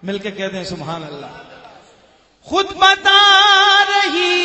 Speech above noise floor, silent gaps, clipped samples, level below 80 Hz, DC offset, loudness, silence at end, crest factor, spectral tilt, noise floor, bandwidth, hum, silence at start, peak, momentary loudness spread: 37 dB; none; under 0.1%; -54 dBFS; under 0.1%; -11 LUFS; 0 s; 16 dB; -2 dB/octave; -52 dBFS; 8.4 kHz; none; 0 s; 0 dBFS; 19 LU